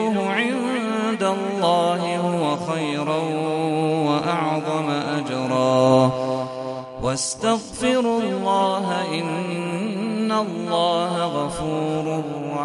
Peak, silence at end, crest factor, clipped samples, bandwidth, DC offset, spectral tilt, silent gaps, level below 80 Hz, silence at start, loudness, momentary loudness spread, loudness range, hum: -4 dBFS; 0 s; 18 dB; under 0.1%; 11.5 kHz; under 0.1%; -5 dB/octave; none; -54 dBFS; 0 s; -22 LUFS; 6 LU; 2 LU; none